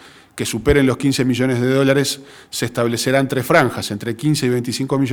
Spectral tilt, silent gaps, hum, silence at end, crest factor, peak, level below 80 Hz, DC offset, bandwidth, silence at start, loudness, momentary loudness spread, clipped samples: -5 dB/octave; none; none; 0 s; 18 dB; 0 dBFS; -38 dBFS; under 0.1%; over 20 kHz; 0.05 s; -18 LUFS; 9 LU; under 0.1%